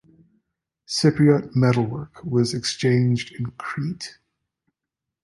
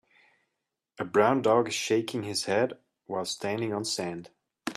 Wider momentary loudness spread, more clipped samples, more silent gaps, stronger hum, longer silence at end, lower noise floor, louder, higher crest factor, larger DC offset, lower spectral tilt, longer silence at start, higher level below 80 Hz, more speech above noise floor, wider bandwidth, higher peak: about the same, 13 LU vs 14 LU; neither; neither; neither; first, 1.15 s vs 0 s; about the same, -85 dBFS vs -84 dBFS; first, -22 LUFS vs -28 LUFS; about the same, 18 dB vs 20 dB; neither; first, -6 dB/octave vs -4 dB/octave; about the same, 0.9 s vs 1 s; first, -56 dBFS vs -74 dBFS; first, 64 dB vs 57 dB; second, 11.5 kHz vs 13.5 kHz; first, -4 dBFS vs -10 dBFS